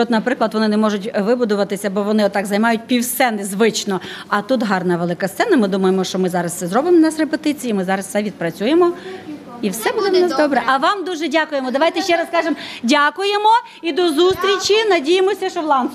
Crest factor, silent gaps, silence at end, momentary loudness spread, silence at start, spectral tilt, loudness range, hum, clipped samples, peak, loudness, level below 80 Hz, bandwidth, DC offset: 14 dB; none; 0 s; 7 LU; 0 s; -4.5 dB/octave; 2 LU; none; under 0.1%; -2 dBFS; -17 LUFS; -60 dBFS; 14.5 kHz; under 0.1%